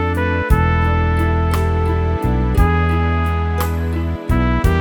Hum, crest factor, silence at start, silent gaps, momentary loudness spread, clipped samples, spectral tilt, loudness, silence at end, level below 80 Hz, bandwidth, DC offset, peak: none; 16 dB; 0 s; none; 4 LU; under 0.1%; -7.5 dB/octave; -17 LUFS; 0 s; -20 dBFS; 18.5 kHz; under 0.1%; 0 dBFS